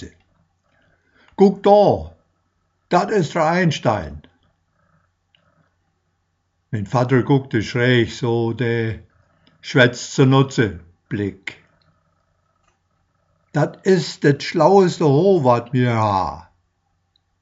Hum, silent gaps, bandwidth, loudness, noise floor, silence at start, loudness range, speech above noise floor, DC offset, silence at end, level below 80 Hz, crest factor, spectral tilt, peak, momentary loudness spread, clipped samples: none; none; 8 kHz; -18 LUFS; -69 dBFS; 0 s; 9 LU; 52 dB; under 0.1%; 1 s; -52 dBFS; 20 dB; -5.5 dB/octave; 0 dBFS; 15 LU; under 0.1%